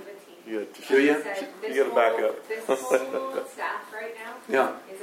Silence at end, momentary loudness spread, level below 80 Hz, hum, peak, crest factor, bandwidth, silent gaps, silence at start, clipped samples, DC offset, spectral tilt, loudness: 0 s; 14 LU; -88 dBFS; none; -8 dBFS; 20 dB; 16 kHz; none; 0 s; under 0.1%; under 0.1%; -3.5 dB/octave; -26 LUFS